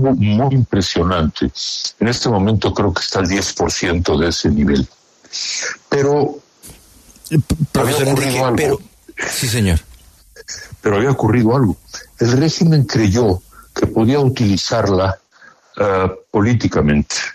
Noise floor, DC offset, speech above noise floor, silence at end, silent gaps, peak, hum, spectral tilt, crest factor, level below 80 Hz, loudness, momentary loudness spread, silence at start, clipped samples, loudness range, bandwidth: -47 dBFS; under 0.1%; 32 dB; 0 s; none; -2 dBFS; none; -5.5 dB/octave; 14 dB; -34 dBFS; -16 LUFS; 8 LU; 0 s; under 0.1%; 3 LU; 13.5 kHz